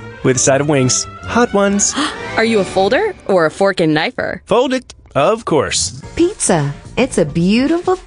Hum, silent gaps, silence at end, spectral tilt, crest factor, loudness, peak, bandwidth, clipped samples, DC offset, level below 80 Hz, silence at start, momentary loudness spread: none; none; 0 s; -4 dB/octave; 14 dB; -15 LUFS; 0 dBFS; 10.5 kHz; under 0.1%; under 0.1%; -40 dBFS; 0 s; 6 LU